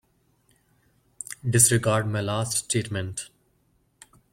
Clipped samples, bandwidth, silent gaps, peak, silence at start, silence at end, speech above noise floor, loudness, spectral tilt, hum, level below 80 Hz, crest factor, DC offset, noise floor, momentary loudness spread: under 0.1%; 16.5 kHz; none; -4 dBFS; 1.3 s; 1.05 s; 43 dB; -23 LUFS; -3.5 dB/octave; none; -58 dBFS; 24 dB; under 0.1%; -67 dBFS; 20 LU